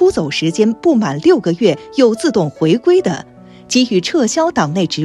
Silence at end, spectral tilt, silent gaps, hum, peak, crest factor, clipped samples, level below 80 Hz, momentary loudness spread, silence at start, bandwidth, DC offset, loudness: 0 s; -5 dB/octave; none; none; 0 dBFS; 14 dB; under 0.1%; -50 dBFS; 4 LU; 0 s; 12 kHz; under 0.1%; -14 LUFS